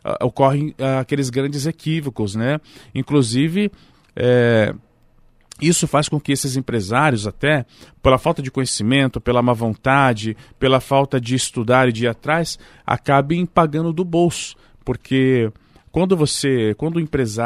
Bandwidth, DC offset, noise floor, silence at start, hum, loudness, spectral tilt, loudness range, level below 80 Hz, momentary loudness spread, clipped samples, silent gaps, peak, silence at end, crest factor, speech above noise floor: 15 kHz; under 0.1%; -53 dBFS; 0.05 s; none; -19 LUFS; -5.5 dB/octave; 2 LU; -44 dBFS; 9 LU; under 0.1%; none; 0 dBFS; 0 s; 18 dB; 35 dB